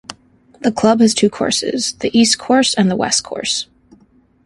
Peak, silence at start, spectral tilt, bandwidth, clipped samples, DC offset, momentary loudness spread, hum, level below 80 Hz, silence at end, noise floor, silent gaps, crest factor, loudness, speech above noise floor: 0 dBFS; 0.1 s; -3.5 dB/octave; 11.5 kHz; under 0.1%; under 0.1%; 8 LU; none; -54 dBFS; 0.8 s; -52 dBFS; none; 16 dB; -15 LUFS; 37 dB